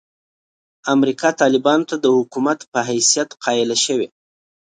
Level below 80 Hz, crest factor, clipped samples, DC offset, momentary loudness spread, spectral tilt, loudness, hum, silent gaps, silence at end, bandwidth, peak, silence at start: -68 dBFS; 18 dB; under 0.1%; under 0.1%; 6 LU; -2.5 dB/octave; -17 LUFS; none; 2.68-2.72 s; 0.65 s; 9.6 kHz; -2 dBFS; 0.85 s